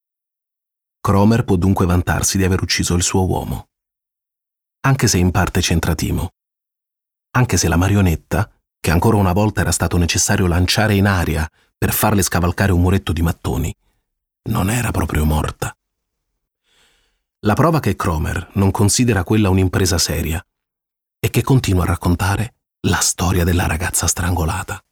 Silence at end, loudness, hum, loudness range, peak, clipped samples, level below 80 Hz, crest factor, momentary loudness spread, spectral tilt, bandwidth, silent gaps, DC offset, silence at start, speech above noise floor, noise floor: 0.1 s; -17 LUFS; none; 5 LU; -2 dBFS; under 0.1%; -30 dBFS; 16 dB; 9 LU; -5 dB/octave; 18.5 kHz; none; 0.2%; 1.05 s; 68 dB; -84 dBFS